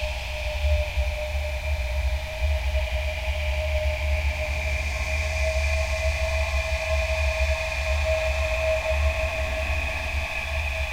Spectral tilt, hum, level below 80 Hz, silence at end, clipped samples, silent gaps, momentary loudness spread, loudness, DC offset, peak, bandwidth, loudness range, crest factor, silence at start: -4 dB/octave; none; -28 dBFS; 0 s; under 0.1%; none; 4 LU; -26 LUFS; under 0.1%; -12 dBFS; 16 kHz; 3 LU; 14 dB; 0 s